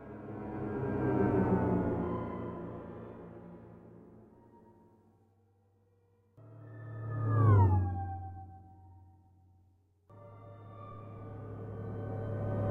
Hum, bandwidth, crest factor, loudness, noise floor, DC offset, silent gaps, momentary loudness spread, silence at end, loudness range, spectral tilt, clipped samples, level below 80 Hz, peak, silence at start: none; 3.3 kHz; 20 dB; -33 LUFS; -69 dBFS; under 0.1%; none; 24 LU; 0 s; 19 LU; -11.5 dB/octave; under 0.1%; -56 dBFS; -14 dBFS; 0 s